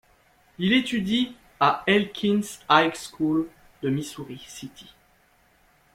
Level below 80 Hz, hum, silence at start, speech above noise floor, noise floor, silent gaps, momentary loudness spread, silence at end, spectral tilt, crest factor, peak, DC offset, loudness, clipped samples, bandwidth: -60 dBFS; none; 0.6 s; 37 dB; -61 dBFS; none; 18 LU; 1.15 s; -5 dB/octave; 22 dB; -4 dBFS; under 0.1%; -24 LUFS; under 0.1%; 16 kHz